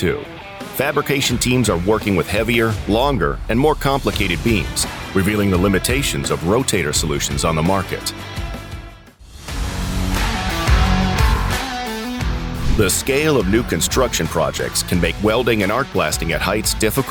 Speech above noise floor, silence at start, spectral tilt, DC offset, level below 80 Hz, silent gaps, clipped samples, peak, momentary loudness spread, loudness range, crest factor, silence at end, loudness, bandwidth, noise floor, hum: 22 dB; 0 s; -4.5 dB/octave; under 0.1%; -26 dBFS; none; under 0.1%; -2 dBFS; 8 LU; 4 LU; 18 dB; 0 s; -18 LUFS; 19.5 kHz; -40 dBFS; none